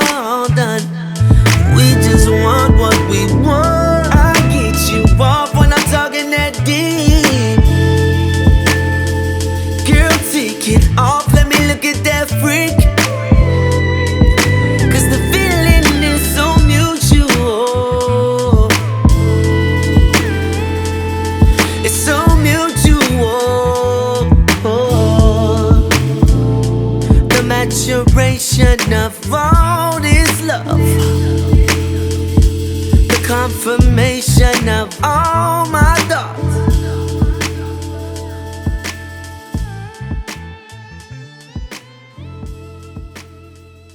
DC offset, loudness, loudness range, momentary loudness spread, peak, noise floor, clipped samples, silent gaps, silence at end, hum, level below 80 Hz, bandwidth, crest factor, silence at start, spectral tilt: under 0.1%; -12 LUFS; 10 LU; 12 LU; 0 dBFS; -39 dBFS; 0.1%; none; 0.7 s; none; -18 dBFS; over 20 kHz; 12 dB; 0 s; -5 dB/octave